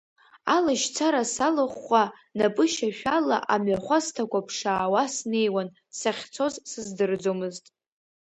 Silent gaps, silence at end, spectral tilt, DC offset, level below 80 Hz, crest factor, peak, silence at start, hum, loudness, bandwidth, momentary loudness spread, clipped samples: none; 0.7 s; -3.5 dB/octave; under 0.1%; -66 dBFS; 18 dB; -8 dBFS; 0.45 s; none; -26 LUFS; 9 kHz; 7 LU; under 0.1%